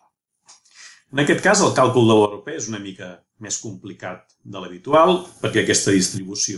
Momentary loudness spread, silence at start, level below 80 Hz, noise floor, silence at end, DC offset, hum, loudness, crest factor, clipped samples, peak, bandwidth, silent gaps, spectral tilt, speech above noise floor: 20 LU; 0.8 s; -58 dBFS; -59 dBFS; 0 s; under 0.1%; none; -18 LUFS; 16 dB; under 0.1%; -4 dBFS; 12 kHz; none; -4 dB/octave; 40 dB